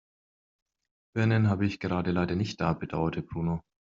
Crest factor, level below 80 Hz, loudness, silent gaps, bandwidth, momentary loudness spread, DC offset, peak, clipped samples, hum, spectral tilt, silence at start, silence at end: 18 dB; -56 dBFS; -29 LUFS; none; 7.6 kHz; 8 LU; under 0.1%; -10 dBFS; under 0.1%; none; -7 dB/octave; 1.15 s; 0.35 s